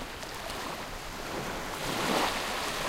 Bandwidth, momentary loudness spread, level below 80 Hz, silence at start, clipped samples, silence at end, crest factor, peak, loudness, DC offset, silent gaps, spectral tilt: 16 kHz; 10 LU; -48 dBFS; 0 s; under 0.1%; 0 s; 20 dB; -14 dBFS; -33 LUFS; under 0.1%; none; -2.5 dB/octave